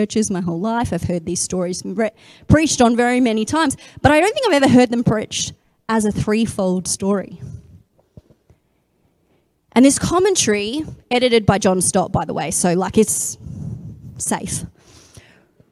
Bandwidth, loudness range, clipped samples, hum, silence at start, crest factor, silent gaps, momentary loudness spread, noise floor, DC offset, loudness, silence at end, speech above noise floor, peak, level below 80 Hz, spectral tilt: 15 kHz; 7 LU; under 0.1%; none; 0 s; 18 dB; none; 13 LU; -63 dBFS; under 0.1%; -17 LUFS; 1 s; 46 dB; 0 dBFS; -42 dBFS; -4.5 dB/octave